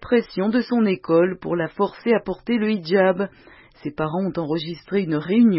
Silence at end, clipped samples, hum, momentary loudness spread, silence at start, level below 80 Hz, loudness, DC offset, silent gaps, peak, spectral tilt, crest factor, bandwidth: 0 s; under 0.1%; none; 8 LU; 0 s; -54 dBFS; -22 LUFS; under 0.1%; none; -6 dBFS; -11 dB/octave; 14 dB; 5.8 kHz